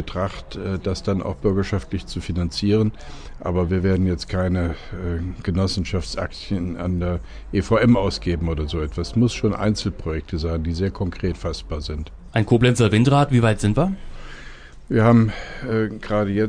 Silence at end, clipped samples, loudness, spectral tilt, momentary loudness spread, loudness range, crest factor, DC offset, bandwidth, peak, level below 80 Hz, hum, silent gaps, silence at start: 0 s; under 0.1%; -22 LUFS; -7 dB/octave; 13 LU; 5 LU; 18 dB; under 0.1%; 10 kHz; -4 dBFS; -34 dBFS; none; none; 0 s